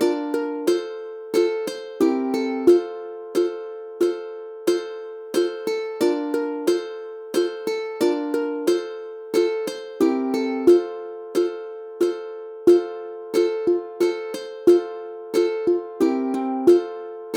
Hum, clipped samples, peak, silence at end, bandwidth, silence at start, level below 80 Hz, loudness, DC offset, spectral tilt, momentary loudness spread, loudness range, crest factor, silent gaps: none; under 0.1%; -4 dBFS; 0 s; 16 kHz; 0 s; -70 dBFS; -22 LUFS; under 0.1%; -4.5 dB/octave; 15 LU; 3 LU; 18 dB; none